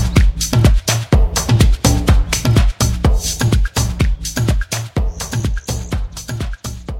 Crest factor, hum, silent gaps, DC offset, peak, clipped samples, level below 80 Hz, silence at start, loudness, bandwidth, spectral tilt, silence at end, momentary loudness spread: 14 dB; none; none; under 0.1%; 0 dBFS; under 0.1%; -18 dBFS; 0 s; -16 LUFS; 16.5 kHz; -4.5 dB/octave; 0 s; 11 LU